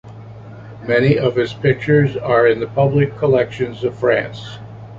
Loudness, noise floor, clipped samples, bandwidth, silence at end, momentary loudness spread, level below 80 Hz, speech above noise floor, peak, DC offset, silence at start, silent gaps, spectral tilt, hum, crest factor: -16 LUFS; -35 dBFS; under 0.1%; 7.6 kHz; 0 s; 21 LU; -48 dBFS; 19 dB; -2 dBFS; under 0.1%; 0.05 s; none; -8 dB/octave; none; 16 dB